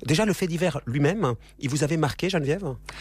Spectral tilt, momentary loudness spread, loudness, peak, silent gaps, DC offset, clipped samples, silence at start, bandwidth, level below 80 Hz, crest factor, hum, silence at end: -5.5 dB/octave; 6 LU; -25 LUFS; -10 dBFS; none; under 0.1%; under 0.1%; 0 s; 15.5 kHz; -48 dBFS; 14 dB; none; 0 s